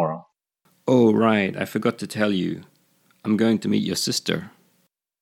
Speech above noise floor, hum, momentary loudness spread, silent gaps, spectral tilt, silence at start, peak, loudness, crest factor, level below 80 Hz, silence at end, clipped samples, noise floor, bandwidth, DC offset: 47 dB; none; 13 LU; none; -5 dB/octave; 0 s; -4 dBFS; -22 LUFS; 20 dB; -68 dBFS; 0.75 s; under 0.1%; -68 dBFS; 16 kHz; under 0.1%